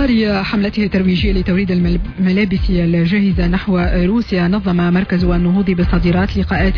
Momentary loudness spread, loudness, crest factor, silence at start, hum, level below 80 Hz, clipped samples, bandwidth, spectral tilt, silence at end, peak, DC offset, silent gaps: 2 LU; -15 LUFS; 10 dB; 0 s; none; -22 dBFS; under 0.1%; 5.4 kHz; -9 dB/octave; 0 s; -4 dBFS; under 0.1%; none